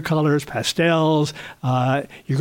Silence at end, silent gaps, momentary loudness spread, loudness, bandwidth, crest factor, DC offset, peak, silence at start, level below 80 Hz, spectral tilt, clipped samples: 0 s; none; 8 LU; -21 LUFS; 17 kHz; 14 dB; under 0.1%; -6 dBFS; 0 s; -56 dBFS; -5.5 dB/octave; under 0.1%